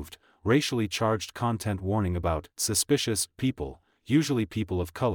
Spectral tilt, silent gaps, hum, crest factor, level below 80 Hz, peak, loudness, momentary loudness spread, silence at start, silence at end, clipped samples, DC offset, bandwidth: -4.5 dB/octave; none; none; 16 dB; -48 dBFS; -12 dBFS; -28 LUFS; 6 LU; 0 s; 0 s; under 0.1%; under 0.1%; 19.5 kHz